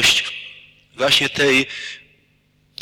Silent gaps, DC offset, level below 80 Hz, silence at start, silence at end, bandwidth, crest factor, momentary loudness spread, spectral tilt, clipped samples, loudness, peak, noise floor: none; under 0.1%; -52 dBFS; 0 s; 0.85 s; over 20 kHz; 16 dB; 19 LU; -2 dB/octave; under 0.1%; -17 LUFS; -4 dBFS; -60 dBFS